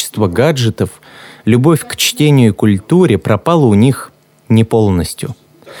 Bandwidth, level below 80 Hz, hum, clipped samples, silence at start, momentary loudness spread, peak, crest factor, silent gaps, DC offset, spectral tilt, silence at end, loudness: 19 kHz; -42 dBFS; none; under 0.1%; 0 s; 11 LU; 0 dBFS; 12 dB; none; under 0.1%; -6 dB/octave; 0 s; -12 LUFS